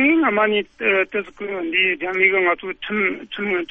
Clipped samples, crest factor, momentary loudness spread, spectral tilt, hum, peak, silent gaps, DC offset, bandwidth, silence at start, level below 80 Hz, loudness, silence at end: under 0.1%; 16 dB; 10 LU; -6.5 dB/octave; none; -4 dBFS; none; under 0.1%; 6 kHz; 0 s; -56 dBFS; -19 LUFS; 0.05 s